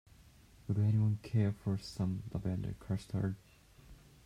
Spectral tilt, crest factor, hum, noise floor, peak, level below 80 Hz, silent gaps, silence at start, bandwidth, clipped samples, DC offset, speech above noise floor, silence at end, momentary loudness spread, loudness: -8 dB/octave; 16 dB; none; -61 dBFS; -20 dBFS; -58 dBFS; none; 0.7 s; 11 kHz; under 0.1%; under 0.1%; 26 dB; 0.3 s; 9 LU; -36 LUFS